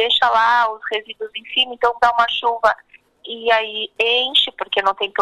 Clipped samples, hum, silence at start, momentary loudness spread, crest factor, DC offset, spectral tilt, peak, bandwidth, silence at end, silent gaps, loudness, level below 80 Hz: under 0.1%; none; 0 s; 11 LU; 18 dB; under 0.1%; -1 dB/octave; 0 dBFS; 12 kHz; 0 s; none; -17 LUFS; -56 dBFS